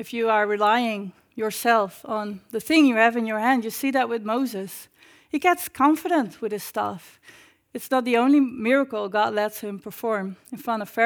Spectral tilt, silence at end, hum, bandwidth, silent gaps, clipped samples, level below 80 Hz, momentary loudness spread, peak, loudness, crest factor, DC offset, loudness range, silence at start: -4 dB/octave; 0 s; none; over 20 kHz; none; under 0.1%; -70 dBFS; 15 LU; -4 dBFS; -23 LUFS; 20 dB; under 0.1%; 3 LU; 0 s